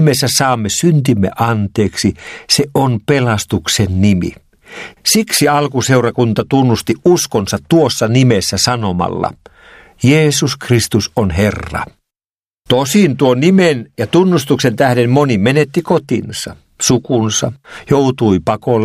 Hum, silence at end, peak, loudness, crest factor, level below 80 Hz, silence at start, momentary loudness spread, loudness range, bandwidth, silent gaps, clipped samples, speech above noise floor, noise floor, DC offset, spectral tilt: none; 0 s; 0 dBFS; -13 LUFS; 14 dB; -44 dBFS; 0 s; 7 LU; 3 LU; 15.5 kHz; none; under 0.1%; over 77 dB; under -90 dBFS; under 0.1%; -5 dB/octave